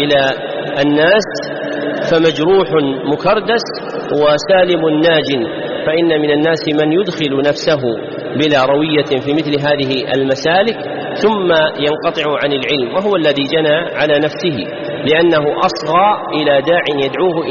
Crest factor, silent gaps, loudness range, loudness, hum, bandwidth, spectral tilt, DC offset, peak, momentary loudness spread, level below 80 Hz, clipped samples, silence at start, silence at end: 12 dB; none; 1 LU; -14 LUFS; none; 7.2 kHz; -3 dB/octave; under 0.1%; 0 dBFS; 8 LU; -50 dBFS; under 0.1%; 0 s; 0 s